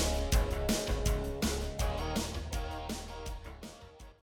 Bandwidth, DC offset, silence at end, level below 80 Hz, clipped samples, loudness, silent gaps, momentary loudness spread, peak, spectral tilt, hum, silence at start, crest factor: 19 kHz; under 0.1%; 0.15 s; -36 dBFS; under 0.1%; -35 LUFS; none; 16 LU; -16 dBFS; -4.5 dB/octave; none; 0 s; 18 dB